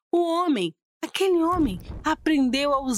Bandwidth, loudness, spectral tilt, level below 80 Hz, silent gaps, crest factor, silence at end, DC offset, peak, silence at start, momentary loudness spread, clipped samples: 15.5 kHz; -24 LUFS; -4.5 dB/octave; -44 dBFS; 0.85-1.00 s; 14 dB; 0 s; under 0.1%; -10 dBFS; 0.15 s; 9 LU; under 0.1%